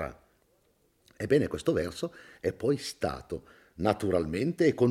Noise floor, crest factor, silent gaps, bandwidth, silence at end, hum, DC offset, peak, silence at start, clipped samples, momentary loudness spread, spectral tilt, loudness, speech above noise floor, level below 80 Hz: -69 dBFS; 20 dB; none; 15.5 kHz; 0 s; none; under 0.1%; -10 dBFS; 0 s; under 0.1%; 13 LU; -6.5 dB/octave; -30 LUFS; 40 dB; -56 dBFS